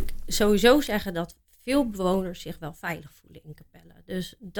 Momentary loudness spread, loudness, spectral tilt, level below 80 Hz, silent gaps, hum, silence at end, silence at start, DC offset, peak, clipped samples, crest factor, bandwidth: 18 LU; -25 LUFS; -4.5 dB/octave; -40 dBFS; none; none; 0 s; 0 s; under 0.1%; -4 dBFS; under 0.1%; 22 dB; 19 kHz